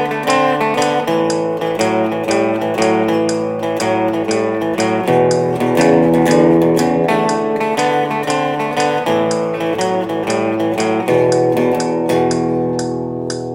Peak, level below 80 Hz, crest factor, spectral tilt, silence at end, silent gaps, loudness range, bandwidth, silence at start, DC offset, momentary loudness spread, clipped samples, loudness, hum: 0 dBFS; -52 dBFS; 14 dB; -5.5 dB/octave; 0 s; none; 3 LU; 16.5 kHz; 0 s; under 0.1%; 6 LU; under 0.1%; -15 LUFS; none